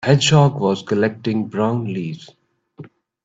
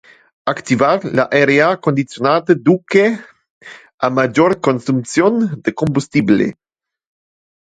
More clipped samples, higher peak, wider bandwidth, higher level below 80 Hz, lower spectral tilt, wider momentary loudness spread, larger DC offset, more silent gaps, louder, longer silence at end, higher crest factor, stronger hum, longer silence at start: neither; about the same, 0 dBFS vs 0 dBFS; second, 8 kHz vs 9.4 kHz; about the same, -54 dBFS vs -56 dBFS; about the same, -5.5 dB/octave vs -6 dB/octave; first, 13 LU vs 7 LU; neither; second, none vs 3.50-3.61 s, 3.94-3.98 s; second, -18 LUFS vs -15 LUFS; second, 0.4 s vs 1.15 s; about the same, 18 dB vs 16 dB; neither; second, 0 s vs 0.45 s